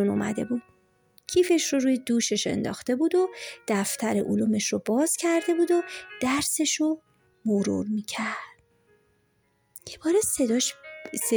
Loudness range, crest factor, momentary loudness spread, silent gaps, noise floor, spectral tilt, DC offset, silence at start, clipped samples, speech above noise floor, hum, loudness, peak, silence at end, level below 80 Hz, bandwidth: 4 LU; 14 dB; 11 LU; none; -69 dBFS; -3.5 dB/octave; under 0.1%; 0 s; under 0.1%; 44 dB; none; -26 LUFS; -12 dBFS; 0 s; -64 dBFS; over 20 kHz